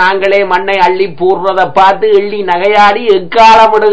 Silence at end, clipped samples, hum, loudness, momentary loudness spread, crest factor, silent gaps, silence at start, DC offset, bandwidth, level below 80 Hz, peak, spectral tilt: 0 s; 6%; none; -8 LUFS; 7 LU; 8 dB; none; 0 s; 6%; 8 kHz; -44 dBFS; 0 dBFS; -4.5 dB/octave